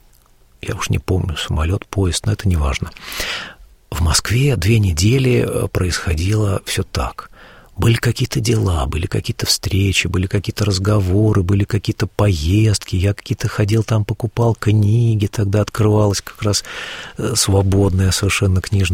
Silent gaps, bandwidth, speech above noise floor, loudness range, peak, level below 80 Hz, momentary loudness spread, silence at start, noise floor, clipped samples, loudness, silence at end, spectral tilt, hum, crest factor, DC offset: none; 16.5 kHz; 34 dB; 3 LU; -2 dBFS; -30 dBFS; 8 LU; 0.65 s; -50 dBFS; under 0.1%; -17 LUFS; 0 s; -5 dB/octave; none; 16 dB; under 0.1%